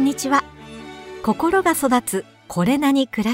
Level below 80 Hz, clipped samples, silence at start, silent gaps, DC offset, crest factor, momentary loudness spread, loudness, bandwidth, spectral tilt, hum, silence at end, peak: -52 dBFS; under 0.1%; 0 s; none; under 0.1%; 16 dB; 19 LU; -20 LUFS; 16 kHz; -4.5 dB/octave; none; 0 s; -4 dBFS